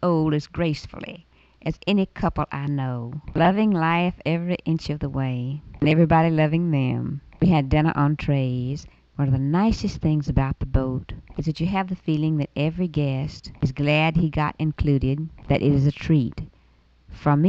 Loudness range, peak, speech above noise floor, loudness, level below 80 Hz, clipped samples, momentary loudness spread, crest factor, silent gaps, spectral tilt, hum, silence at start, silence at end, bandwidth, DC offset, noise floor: 4 LU; -6 dBFS; 35 dB; -23 LUFS; -38 dBFS; under 0.1%; 11 LU; 16 dB; none; -8 dB/octave; none; 0 s; 0 s; 7.4 kHz; under 0.1%; -57 dBFS